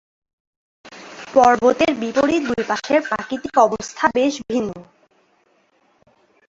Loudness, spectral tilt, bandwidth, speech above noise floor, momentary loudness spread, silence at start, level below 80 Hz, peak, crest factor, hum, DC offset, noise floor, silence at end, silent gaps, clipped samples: -18 LUFS; -4 dB/octave; 8 kHz; 43 dB; 15 LU; 0.85 s; -56 dBFS; 0 dBFS; 20 dB; none; under 0.1%; -61 dBFS; 1.65 s; none; under 0.1%